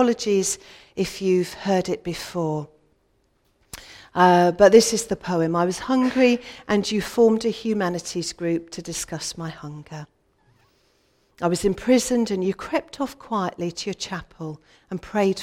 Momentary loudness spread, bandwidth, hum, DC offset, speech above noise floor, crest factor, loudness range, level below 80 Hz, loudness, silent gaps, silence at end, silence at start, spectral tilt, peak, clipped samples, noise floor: 19 LU; 16.5 kHz; none; under 0.1%; 44 dB; 20 dB; 10 LU; -52 dBFS; -22 LUFS; none; 0 s; 0 s; -4.5 dB/octave; -2 dBFS; under 0.1%; -66 dBFS